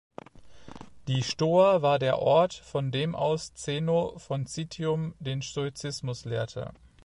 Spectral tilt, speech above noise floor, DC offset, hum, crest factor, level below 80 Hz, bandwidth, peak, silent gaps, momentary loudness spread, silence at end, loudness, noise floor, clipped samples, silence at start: -5.5 dB/octave; 21 dB; under 0.1%; none; 18 dB; -58 dBFS; 11.5 kHz; -10 dBFS; none; 16 LU; 0.3 s; -28 LUFS; -48 dBFS; under 0.1%; 0.35 s